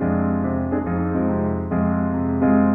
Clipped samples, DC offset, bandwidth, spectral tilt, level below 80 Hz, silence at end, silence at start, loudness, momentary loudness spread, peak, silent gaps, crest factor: under 0.1%; 0.2%; 2.7 kHz; -13 dB/octave; -40 dBFS; 0 s; 0 s; -21 LUFS; 4 LU; -6 dBFS; none; 14 dB